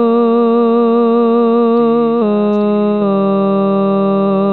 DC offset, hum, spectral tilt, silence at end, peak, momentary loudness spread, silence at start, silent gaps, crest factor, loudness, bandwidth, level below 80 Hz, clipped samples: 0.6%; none; -11 dB/octave; 0 s; -4 dBFS; 2 LU; 0 s; none; 8 dB; -12 LUFS; 4.4 kHz; -70 dBFS; under 0.1%